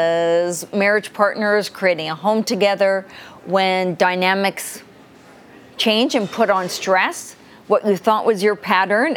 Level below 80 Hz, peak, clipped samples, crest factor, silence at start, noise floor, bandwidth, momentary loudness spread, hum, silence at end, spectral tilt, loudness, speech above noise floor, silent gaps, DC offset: -68 dBFS; 0 dBFS; under 0.1%; 18 dB; 0 s; -45 dBFS; 19 kHz; 6 LU; none; 0 s; -4 dB/octave; -18 LUFS; 27 dB; none; under 0.1%